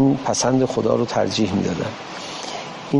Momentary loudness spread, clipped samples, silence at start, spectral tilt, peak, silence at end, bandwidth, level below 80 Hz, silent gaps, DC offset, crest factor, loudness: 12 LU; under 0.1%; 0 s; -5 dB/octave; -6 dBFS; 0 s; 11.5 kHz; -52 dBFS; none; under 0.1%; 14 dB; -21 LUFS